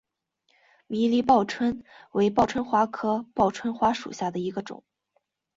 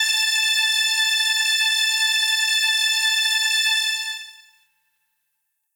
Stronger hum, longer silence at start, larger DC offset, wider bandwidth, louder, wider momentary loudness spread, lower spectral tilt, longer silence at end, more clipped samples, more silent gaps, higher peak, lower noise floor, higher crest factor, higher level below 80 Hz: neither; first, 0.9 s vs 0 s; neither; second, 7.8 kHz vs over 20 kHz; second, -25 LUFS vs -17 LUFS; first, 12 LU vs 3 LU; first, -6 dB/octave vs 10.5 dB/octave; second, 0.8 s vs 1.45 s; neither; neither; first, -6 dBFS vs -10 dBFS; about the same, -74 dBFS vs -75 dBFS; first, 20 dB vs 12 dB; first, -58 dBFS vs -90 dBFS